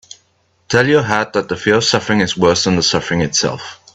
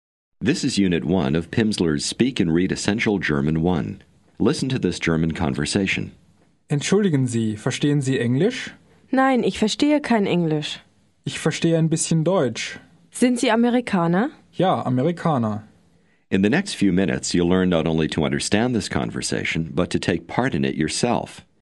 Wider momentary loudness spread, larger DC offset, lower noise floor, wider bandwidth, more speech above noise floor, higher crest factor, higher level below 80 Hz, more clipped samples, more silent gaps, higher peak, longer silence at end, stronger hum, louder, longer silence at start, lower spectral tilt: about the same, 5 LU vs 7 LU; neither; about the same, -59 dBFS vs -60 dBFS; second, 8.4 kHz vs 11.5 kHz; first, 44 dB vs 39 dB; about the same, 16 dB vs 20 dB; about the same, -48 dBFS vs -48 dBFS; neither; neither; about the same, 0 dBFS vs -2 dBFS; about the same, 0.2 s vs 0.2 s; neither; first, -14 LUFS vs -21 LUFS; first, 0.7 s vs 0.4 s; second, -4 dB/octave vs -5.5 dB/octave